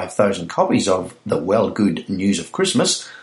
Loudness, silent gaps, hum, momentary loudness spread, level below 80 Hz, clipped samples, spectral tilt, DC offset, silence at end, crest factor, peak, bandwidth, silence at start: -19 LUFS; none; none; 5 LU; -56 dBFS; under 0.1%; -4.5 dB/octave; under 0.1%; 0 s; 16 dB; -2 dBFS; 11.5 kHz; 0 s